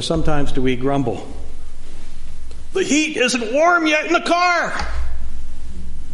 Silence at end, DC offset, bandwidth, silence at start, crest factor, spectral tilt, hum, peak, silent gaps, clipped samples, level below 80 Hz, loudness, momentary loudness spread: 0 s; under 0.1%; 11 kHz; 0 s; 14 dB; -4 dB/octave; none; -2 dBFS; none; under 0.1%; -24 dBFS; -18 LUFS; 22 LU